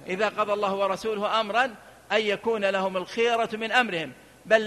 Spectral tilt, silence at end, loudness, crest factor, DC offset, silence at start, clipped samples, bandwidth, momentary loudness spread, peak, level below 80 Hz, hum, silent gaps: -4 dB/octave; 0 s; -25 LUFS; 20 dB; under 0.1%; 0 s; under 0.1%; 13 kHz; 5 LU; -4 dBFS; -66 dBFS; none; none